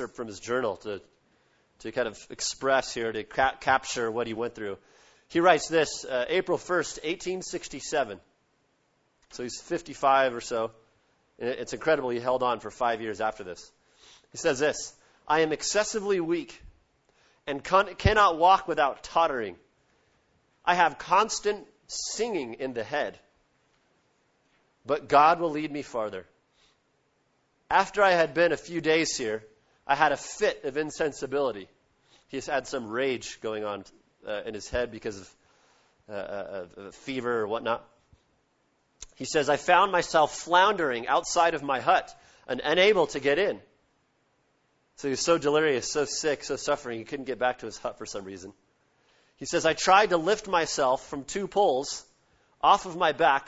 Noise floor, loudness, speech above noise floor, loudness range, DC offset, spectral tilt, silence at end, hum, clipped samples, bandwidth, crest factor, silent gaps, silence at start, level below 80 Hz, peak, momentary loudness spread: -71 dBFS; -27 LUFS; 44 dB; 9 LU; under 0.1%; -3.5 dB/octave; 0.05 s; none; under 0.1%; 8.2 kHz; 24 dB; none; 0 s; -54 dBFS; -4 dBFS; 16 LU